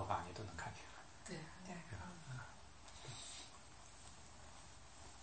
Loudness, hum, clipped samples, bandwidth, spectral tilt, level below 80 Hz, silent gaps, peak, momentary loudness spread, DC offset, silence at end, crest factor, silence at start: -53 LUFS; none; under 0.1%; 8.4 kHz; -4 dB/octave; -66 dBFS; none; -24 dBFS; 10 LU; under 0.1%; 0 s; 28 dB; 0 s